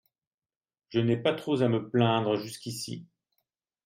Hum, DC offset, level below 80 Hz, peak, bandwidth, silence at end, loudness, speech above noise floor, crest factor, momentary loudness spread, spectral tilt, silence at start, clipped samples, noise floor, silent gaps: none; under 0.1%; -72 dBFS; -12 dBFS; 16 kHz; 0.8 s; -28 LUFS; over 62 dB; 20 dB; 12 LU; -6 dB/octave; 0.9 s; under 0.1%; under -90 dBFS; none